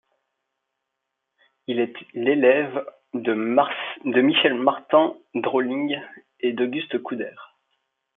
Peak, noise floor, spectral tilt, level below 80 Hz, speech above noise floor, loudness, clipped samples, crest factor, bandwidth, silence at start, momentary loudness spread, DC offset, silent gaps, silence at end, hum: -4 dBFS; -81 dBFS; -8.5 dB/octave; -76 dBFS; 59 dB; -22 LUFS; under 0.1%; 20 dB; 3.9 kHz; 1.7 s; 13 LU; under 0.1%; none; 0.7 s; none